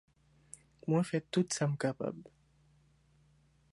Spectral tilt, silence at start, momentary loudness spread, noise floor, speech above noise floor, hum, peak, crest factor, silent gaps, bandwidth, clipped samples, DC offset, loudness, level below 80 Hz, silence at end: -5.5 dB/octave; 0.85 s; 23 LU; -68 dBFS; 35 dB; none; -18 dBFS; 20 dB; none; 11.5 kHz; under 0.1%; under 0.1%; -34 LUFS; -72 dBFS; 1.5 s